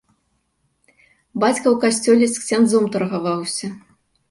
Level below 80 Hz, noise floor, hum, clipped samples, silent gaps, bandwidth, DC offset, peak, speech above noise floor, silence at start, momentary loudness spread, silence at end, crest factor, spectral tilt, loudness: -64 dBFS; -68 dBFS; none; under 0.1%; none; 11.5 kHz; under 0.1%; -4 dBFS; 50 dB; 1.35 s; 10 LU; 0.5 s; 16 dB; -4.5 dB/octave; -18 LUFS